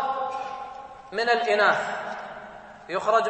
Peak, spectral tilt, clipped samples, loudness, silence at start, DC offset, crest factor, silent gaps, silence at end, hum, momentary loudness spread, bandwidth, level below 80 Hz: -8 dBFS; -3 dB/octave; under 0.1%; -25 LUFS; 0 s; under 0.1%; 18 dB; none; 0 s; none; 21 LU; 8.8 kHz; -66 dBFS